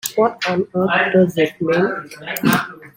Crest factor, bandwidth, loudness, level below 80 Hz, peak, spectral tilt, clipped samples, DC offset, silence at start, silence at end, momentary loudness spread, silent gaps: 18 dB; 16.5 kHz; -18 LUFS; -58 dBFS; 0 dBFS; -5 dB/octave; under 0.1%; under 0.1%; 0.05 s; 0.1 s; 6 LU; none